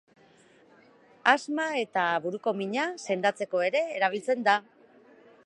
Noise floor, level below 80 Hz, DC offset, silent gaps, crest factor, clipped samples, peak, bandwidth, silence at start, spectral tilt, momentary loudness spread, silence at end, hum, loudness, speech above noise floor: -59 dBFS; -86 dBFS; under 0.1%; none; 24 dB; under 0.1%; -6 dBFS; 11 kHz; 1.25 s; -4 dB/octave; 6 LU; 0.85 s; none; -27 LUFS; 32 dB